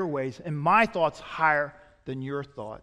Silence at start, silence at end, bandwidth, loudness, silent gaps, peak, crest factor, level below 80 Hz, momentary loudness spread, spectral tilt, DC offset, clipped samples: 0 s; 0.05 s; 11.5 kHz; -26 LUFS; none; -8 dBFS; 18 dB; -60 dBFS; 16 LU; -6.5 dB/octave; under 0.1%; under 0.1%